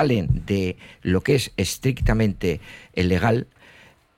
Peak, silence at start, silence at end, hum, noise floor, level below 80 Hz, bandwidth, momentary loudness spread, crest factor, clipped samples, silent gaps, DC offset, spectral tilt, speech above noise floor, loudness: -6 dBFS; 0 s; 0.75 s; none; -52 dBFS; -34 dBFS; 16.5 kHz; 10 LU; 16 dB; under 0.1%; none; under 0.1%; -6 dB/octave; 30 dB; -23 LUFS